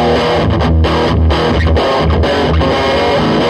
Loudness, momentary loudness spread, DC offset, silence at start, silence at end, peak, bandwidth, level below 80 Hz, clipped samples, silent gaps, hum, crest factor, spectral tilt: -12 LUFS; 0 LU; under 0.1%; 0 s; 0 s; 0 dBFS; 10 kHz; -18 dBFS; under 0.1%; none; none; 10 dB; -6.5 dB/octave